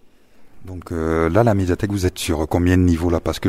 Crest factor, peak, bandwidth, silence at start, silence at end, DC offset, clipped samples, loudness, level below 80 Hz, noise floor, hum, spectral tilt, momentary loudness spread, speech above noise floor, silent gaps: 18 dB; 0 dBFS; 15.5 kHz; 0.4 s; 0 s; under 0.1%; under 0.1%; -19 LUFS; -34 dBFS; -46 dBFS; none; -6.5 dB/octave; 11 LU; 28 dB; none